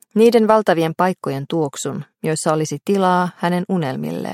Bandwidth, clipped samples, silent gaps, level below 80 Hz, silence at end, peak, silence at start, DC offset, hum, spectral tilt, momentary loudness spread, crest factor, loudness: 16 kHz; under 0.1%; none; -66 dBFS; 0 s; -2 dBFS; 0.15 s; under 0.1%; none; -5.5 dB/octave; 11 LU; 16 dB; -18 LUFS